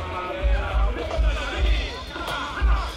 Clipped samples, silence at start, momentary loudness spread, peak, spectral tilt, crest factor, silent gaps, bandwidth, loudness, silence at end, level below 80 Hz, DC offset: under 0.1%; 0 s; 5 LU; -10 dBFS; -5.5 dB/octave; 12 dB; none; 11 kHz; -26 LUFS; 0 s; -24 dBFS; under 0.1%